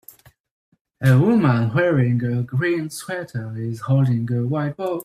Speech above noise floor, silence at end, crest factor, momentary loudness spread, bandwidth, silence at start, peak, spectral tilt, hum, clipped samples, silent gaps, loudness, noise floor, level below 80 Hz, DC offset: 29 dB; 0 s; 16 dB; 12 LU; 14.5 kHz; 1 s; -4 dBFS; -8 dB/octave; none; under 0.1%; none; -20 LUFS; -49 dBFS; -56 dBFS; under 0.1%